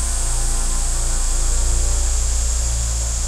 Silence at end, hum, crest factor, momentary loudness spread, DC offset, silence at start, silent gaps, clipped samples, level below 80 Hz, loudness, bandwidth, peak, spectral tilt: 0 s; none; 10 dB; 2 LU; under 0.1%; 0 s; none; under 0.1%; -18 dBFS; -21 LUFS; 14 kHz; -6 dBFS; -2.5 dB/octave